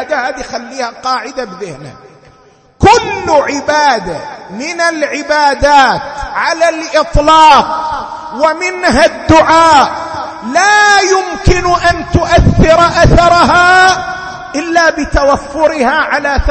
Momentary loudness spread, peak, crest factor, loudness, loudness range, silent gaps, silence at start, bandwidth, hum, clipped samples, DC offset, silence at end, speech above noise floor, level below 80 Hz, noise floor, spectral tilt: 15 LU; 0 dBFS; 10 dB; -9 LUFS; 5 LU; none; 0 s; 11 kHz; none; 0.5%; under 0.1%; 0 s; 35 dB; -24 dBFS; -44 dBFS; -4.5 dB/octave